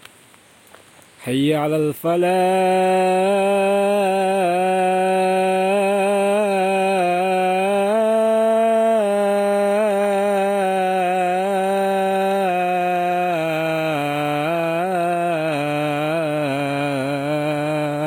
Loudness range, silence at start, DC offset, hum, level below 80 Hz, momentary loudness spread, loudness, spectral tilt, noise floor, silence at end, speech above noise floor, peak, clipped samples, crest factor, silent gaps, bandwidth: 3 LU; 1.2 s; under 0.1%; none; -72 dBFS; 4 LU; -19 LUFS; -5.5 dB/octave; -49 dBFS; 0 s; 32 dB; -8 dBFS; under 0.1%; 12 dB; none; 16.5 kHz